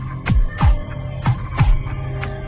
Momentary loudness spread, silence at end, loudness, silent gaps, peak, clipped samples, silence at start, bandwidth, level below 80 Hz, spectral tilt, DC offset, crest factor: 8 LU; 0 s; -21 LUFS; none; -4 dBFS; under 0.1%; 0 s; 4 kHz; -20 dBFS; -11 dB/octave; under 0.1%; 14 dB